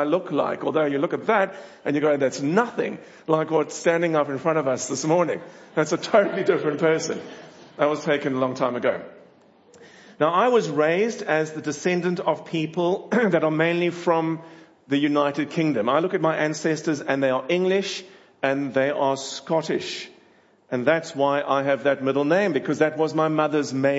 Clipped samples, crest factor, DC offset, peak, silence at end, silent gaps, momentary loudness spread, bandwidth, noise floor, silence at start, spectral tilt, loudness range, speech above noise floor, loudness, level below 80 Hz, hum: under 0.1%; 18 dB; under 0.1%; -4 dBFS; 0 s; none; 7 LU; 8 kHz; -57 dBFS; 0 s; -5 dB/octave; 2 LU; 34 dB; -23 LUFS; -74 dBFS; none